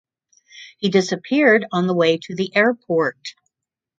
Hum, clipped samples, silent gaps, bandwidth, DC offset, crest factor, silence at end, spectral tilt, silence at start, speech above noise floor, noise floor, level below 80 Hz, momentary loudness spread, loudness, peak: none; under 0.1%; none; 7.8 kHz; under 0.1%; 18 dB; 0.65 s; -5.5 dB/octave; 0.55 s; 67 dB; -86 dBFS; -68 dBFS; 10 LU; -18 LUFS; -2 dBFS